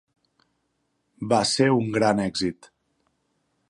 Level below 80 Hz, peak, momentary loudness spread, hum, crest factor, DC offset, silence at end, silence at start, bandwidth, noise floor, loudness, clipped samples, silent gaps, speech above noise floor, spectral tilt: -60 dBFS; -6 dBFS; 9 LU; none; 20 dB; under 0.1%; 1.2 s; 1.2 s; 11.5 kHz; -74 dBFS; -22 LUFS; under 0.1%; none; 51 dB; -4.5 dB/octave